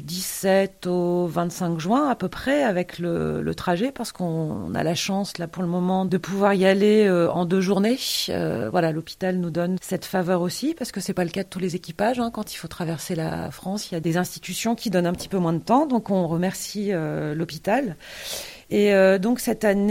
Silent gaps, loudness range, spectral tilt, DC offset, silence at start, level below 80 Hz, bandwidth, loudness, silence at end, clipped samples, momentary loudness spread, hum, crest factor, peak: none; 6 LU; -5.5 dB/octave; under 0.1%; 0 s; -54 dBFS; 16.5 kHz; -23 LUFS; 0 s; under 0.1%; 10 LU; none; 18 dB; -6 dBFS